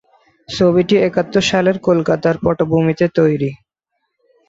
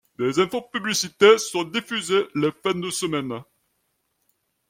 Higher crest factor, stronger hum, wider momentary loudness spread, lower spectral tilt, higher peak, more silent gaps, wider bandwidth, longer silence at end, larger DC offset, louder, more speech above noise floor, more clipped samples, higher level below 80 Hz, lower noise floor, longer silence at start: second, 14 dB vs 22 dB; neither; second, 3 LU vs 11 LU; first, -6 dB/octave vs -3.5 dB/octave; about the same, -2 dBFS vs -2 dBFS; neither; second, 7.8 kHz vs 16.5 kHz; second, 0.95 s vs 1.25 s; neither; first, -15 LUFS vs -22 LUFS; first, 58 dB vs 51 dB; neither; first, -46 dBFS vs -66 dBFS; about the same, -73 dBFS vs -73 dBFS; first, 0.5 s vs 0.2 s